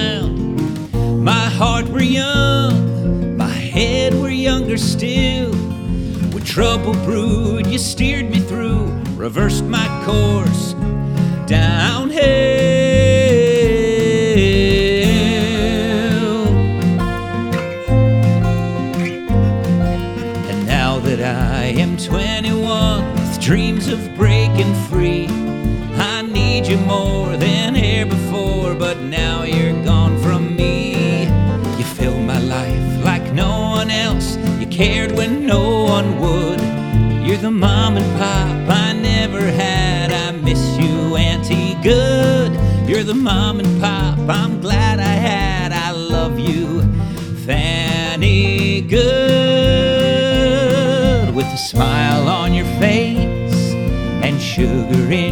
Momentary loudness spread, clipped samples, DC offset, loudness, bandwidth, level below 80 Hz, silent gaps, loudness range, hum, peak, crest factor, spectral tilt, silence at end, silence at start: 6 LU; under 0.1%; under 0.1%; -16 LUFS; 18.5 kHz; -26 dBFS; none; 4 LU; none; 0 dBFS; 14 dB; -6 dB/octave; 0 s; 0 s